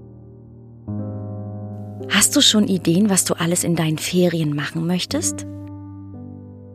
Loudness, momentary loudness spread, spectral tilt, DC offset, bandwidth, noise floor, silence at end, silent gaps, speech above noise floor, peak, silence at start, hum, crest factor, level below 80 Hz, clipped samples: -18 LUFS; 23 LU; -3.5 dB/octave; under 0.1%; 15.5 kHz; -42 dBFS; 0 s; none; 23 dB; -2 dBFS; 0 s; none; 20 dB; -56 dBFS; under 0.1%